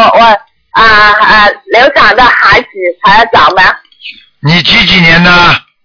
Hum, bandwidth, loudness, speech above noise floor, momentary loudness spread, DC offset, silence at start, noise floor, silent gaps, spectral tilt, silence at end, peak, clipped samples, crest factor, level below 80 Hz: none; 5.4 kHz; -4 LUFS; 25 dB; 7 LU; under 0.1%; 0 s; -29 dBFS; none; -5 dB/octave; 0.25 s; 0 dBFS; 10%; 6 dB; -30 dBFS